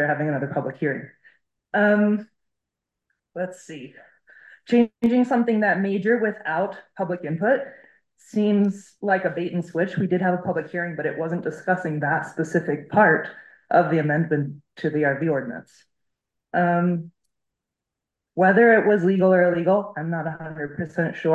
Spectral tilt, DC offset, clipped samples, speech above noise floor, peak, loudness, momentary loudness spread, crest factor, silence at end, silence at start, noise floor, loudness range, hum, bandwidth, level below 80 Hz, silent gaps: -8 dB/octave; under 0.1%; under 0.1%; 64 dB; -4 dBFS; -22 LUFS; 13 LU; 18 dB; 0 s; 0 s; -85 dBFS; 6 LU; none; 8.8 kHz; -68 dBFS; none